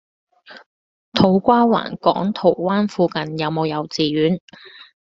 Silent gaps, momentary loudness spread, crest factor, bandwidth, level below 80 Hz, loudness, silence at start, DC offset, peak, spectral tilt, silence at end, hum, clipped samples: 0.66-1.12 s, 4.40-4.48 s; 8 LU; 18 dB; 7.6 kHz; -56 dBFS; -18 LUFS; 0.5 s; under 0.1%; 0 dBFS; -5 dB/octave; 0.2 s; none; under 0.1%